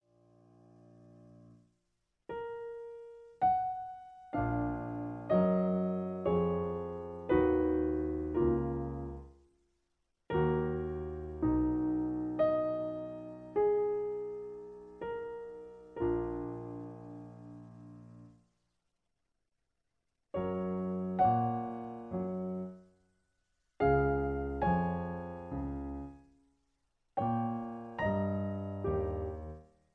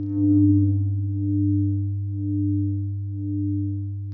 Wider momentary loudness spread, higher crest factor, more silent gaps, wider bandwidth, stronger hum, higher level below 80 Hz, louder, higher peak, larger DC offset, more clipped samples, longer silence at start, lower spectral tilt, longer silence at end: first, 18 LU vs 10 LU; about the same, 18 dB vs 14 dB; neither; first, 4.8 kHz vs 1.1 kHz; neither; second, -50 dBFS vs -38 dBFS; second, -34 LUFS vs -23 LUFS; second, -16 dBFS vs -10 dBFS; neither; neither; first, 1.05 s vs 0 s; second, -10.5 dB/octave vs -16 dB/octave; first, 0.3 s vs 0 s